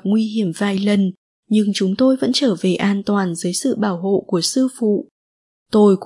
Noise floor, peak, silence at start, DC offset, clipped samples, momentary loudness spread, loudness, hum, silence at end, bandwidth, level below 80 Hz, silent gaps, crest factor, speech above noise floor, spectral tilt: under -90 dBFS; -4 dBFS; 0.05 s; under 0.1%; under 0.1%; 5 LU; -18 LUFS; none; 0 s; 11.5 kHz; -64 dBFS; 1.18-1.43 s, 5.11-5.66 s; 14 dB; over 73 dB; -5.5 dB/octave